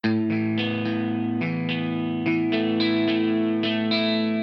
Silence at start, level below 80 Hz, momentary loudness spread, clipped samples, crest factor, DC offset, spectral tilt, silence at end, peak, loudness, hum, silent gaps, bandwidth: 0.05 s; -70 dBFS; 4 LU; under 0.1%; 14 dB; under 0.1%; -8 dB/octave; 0 s; -10 dBFS; -24 LUFS; none; none; 6 kHz